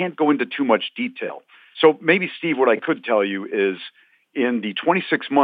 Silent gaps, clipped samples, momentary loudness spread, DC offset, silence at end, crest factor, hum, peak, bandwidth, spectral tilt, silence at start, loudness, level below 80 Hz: none; under 0.1%; 14 LU; under 0.1%; 0 s; 18 dB; none; -2 dBFS; 4.9 kHz; -9 dB/octave; 0 s; -20 LUFS; -86 dBFS